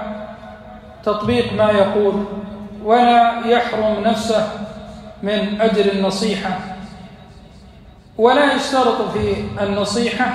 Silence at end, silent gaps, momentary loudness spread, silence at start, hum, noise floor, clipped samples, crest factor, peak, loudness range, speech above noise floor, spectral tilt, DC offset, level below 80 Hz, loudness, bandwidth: 0 s; none; 20 LU; 0 s; none; -42 dBFS; under 0.1%; 16 dB; -2 dBFS; 5 LU; 26 dB; -5 dB/octave; under 0.1%; -44 dBFS; -17 LUFS; 13.5 kHz